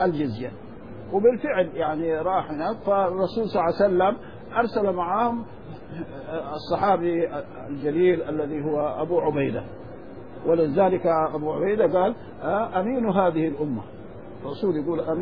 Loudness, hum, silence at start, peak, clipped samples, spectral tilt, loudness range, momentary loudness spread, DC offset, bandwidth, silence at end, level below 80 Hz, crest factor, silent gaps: -24 LUFS; none; 0 s; -8 dBFS; under 0.1%; -9.5 dB/octave; 3 LU; 16 LU; 0.6%; 5.2 kHz; 0 s; -54 dBFS; 16 dB; none